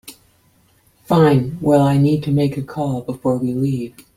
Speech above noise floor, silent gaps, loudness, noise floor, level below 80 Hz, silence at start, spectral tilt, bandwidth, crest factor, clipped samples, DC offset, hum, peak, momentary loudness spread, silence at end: 40 dB; none; -17 LUFS; -56 dBFS; -50 dBFS; 0.05 s; -8 dB/octave; 15 kHz; 16 dB; under 0.1%; under 0.1%; none; -2 dBFS; 9 LU; 0.3 s